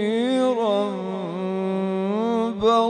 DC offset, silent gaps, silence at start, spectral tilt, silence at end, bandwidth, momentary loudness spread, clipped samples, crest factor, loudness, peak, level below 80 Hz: under 0.1%; none; 0 s; -6.5 dB/octave; 0 s; 9.8 kHz; 7 LU; under 0.1%; 16 dB; -23 LUFS; -6 dBFS; -60 dBFS